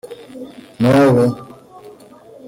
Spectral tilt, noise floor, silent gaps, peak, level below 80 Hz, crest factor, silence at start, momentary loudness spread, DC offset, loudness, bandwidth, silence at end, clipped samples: -7.5 dB/octave; -42 dBFS; none; -4 dBFS; -52 dBFS; 14 dB; 0.05 s; 23 LU; under 0.1%; -14 LUFS; 16.5 kHz; 0 s; under 0.1%